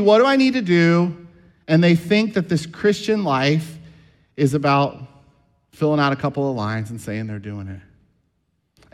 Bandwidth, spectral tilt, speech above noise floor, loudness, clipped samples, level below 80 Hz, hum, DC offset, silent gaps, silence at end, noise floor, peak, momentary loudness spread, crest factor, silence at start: 12.5 kHz; -6.5 dB/octave; 51 dB; -19 LUFS; under 0.1%; -58 dBFS; none; under 0.1%; none; 1.15 s; -69 dBFS; -2 dBFS; 17 LU; 16 dB; 0 s